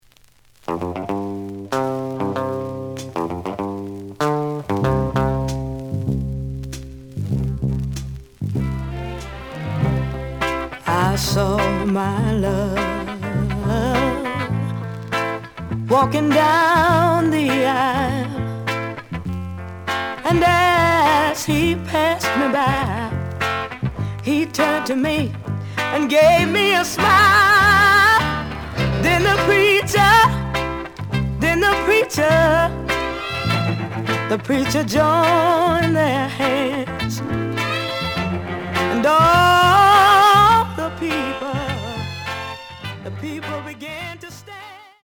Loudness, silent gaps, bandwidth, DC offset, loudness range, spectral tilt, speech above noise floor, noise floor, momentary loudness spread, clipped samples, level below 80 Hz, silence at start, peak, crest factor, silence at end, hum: -18 LUFS; none; over 20 kHz; under 0.1%; 11 LU; -5 dB/octave; 37 dB; -52 dBFS; 16 LU; under 0.1%; -38 dBFS; 0.7 s; -2 dBFS; 16 dB; 0.2 s; none